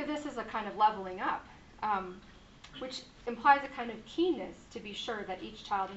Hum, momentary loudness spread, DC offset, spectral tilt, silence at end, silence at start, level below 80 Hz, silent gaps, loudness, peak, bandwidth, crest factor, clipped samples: none; 16 LU; under 0.1%; -2 dB/octave; 0 s; 0 s; -62 dBFS; none; -34 LUFS; -12 dBFS; 8 kHz; 24 dB; under 0.1%